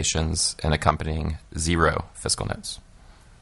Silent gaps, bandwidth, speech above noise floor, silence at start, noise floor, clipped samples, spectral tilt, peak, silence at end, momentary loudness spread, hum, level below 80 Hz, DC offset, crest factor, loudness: none; 11.5 kHz; 25 dB; 0 s; -50 dBFS; under 0.1%; -3.5 dB/octave; 0 dBFS; 0.05 s; 10 LU; none; -38 dBFS; under 0.1%; 26 dB; -24 LUFS